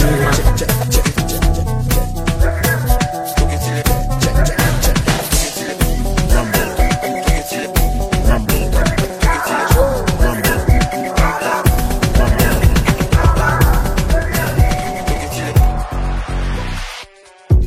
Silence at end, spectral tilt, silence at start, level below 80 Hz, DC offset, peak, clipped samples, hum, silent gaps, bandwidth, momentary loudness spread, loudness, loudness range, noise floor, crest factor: 0 s; -5 dB/octave; 0 s; -16 dBFS; under 0.1%; 0 dBFS; under 0.1%; none; none; 16.5 kHz; 6 LU; -16 LUFS; 2 LU; -39 dBFS; 14 dB